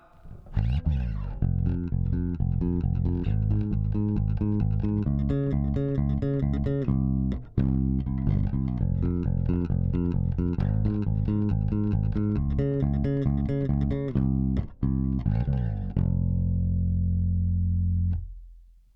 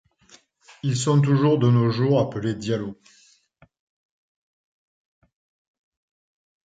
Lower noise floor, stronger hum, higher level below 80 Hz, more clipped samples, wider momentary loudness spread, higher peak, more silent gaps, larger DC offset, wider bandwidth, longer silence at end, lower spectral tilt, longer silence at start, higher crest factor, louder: second, -50 dBFS vs -59 dBFS; neither; first, -32 dBFS vs -60 dBFS; neither; second, 3 LU vs 10 LU; second, -12 dBFS vs -6 dBFS; neither; neither; second, 4.4 kHz vs 9.2 kHz; second, 0.35 s vs 3.75 s; first, -11.5 dB/octave vs -7 dB/octave; second, 0.25 s vs 0.85 s; about the same, 14 dB vs 18 dB; second, -27 LUFS vs -21 LUFS